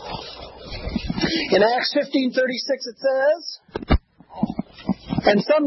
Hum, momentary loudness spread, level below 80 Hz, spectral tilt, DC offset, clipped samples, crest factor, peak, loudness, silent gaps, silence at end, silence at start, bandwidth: none; 16 LU; -36 dBFS; -6 dB/octave; under 0.1%; under 0.1%; 18 dB; -4 dBFS; -22 LUFS; none; 0 s; 0 s; 6 kHz